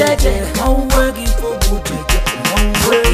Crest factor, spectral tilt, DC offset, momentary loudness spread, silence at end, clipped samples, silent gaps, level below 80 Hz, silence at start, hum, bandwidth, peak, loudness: 14 dB; -4 dB/octave; under 0.1%; 5 LU; 0 s; under 0.1%; none; -16 dBFS; 0 s; none; 15.5 kHz; 0 dBFS; -15 LUFS